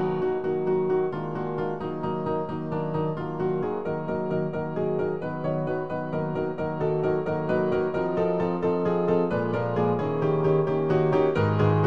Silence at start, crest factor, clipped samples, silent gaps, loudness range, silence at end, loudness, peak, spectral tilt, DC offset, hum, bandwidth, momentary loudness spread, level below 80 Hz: 0 s; 16 dB; under 0.1%; none; 4 LU; 0 s; -26 LUFS; -10 dBFS; -9.5 dB/octave; 0.6%; none; 6.2 kHz; 7 LU; -56 dBFS